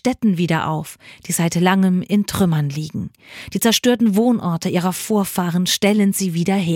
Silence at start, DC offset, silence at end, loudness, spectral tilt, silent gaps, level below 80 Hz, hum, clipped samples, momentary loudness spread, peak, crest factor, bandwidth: 0.05 s; under 0.1%; 0 s; -18 LUFS; -5 dB/octave; none; -52 dBFS; none; under 0.1%; 12 LU; -2 dBFS; 16 dB; 17 kHz